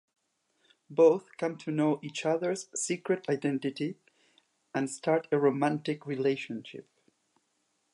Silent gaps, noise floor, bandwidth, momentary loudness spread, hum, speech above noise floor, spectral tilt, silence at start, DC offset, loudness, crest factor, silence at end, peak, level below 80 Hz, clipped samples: none; -76 dBFS; 11.5 kHz; 13 LU; none; 47 dB; -5 dB/octave; 0.9 s; under 0.1%; -30 LUFS; 20 dB; 1.1 s; -12 dBFS; -84 dBFS; under 0.1%